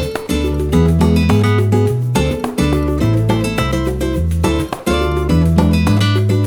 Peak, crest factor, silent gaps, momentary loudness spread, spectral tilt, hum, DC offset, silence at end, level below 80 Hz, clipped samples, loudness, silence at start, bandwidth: 0 dBFS; 14 dB; none; 6 LU; -7 dB/octave; none; under 0.1%; 0 s; -24 dBFS; under 0.1%; -15 LUFS; 0 s; 18 kHz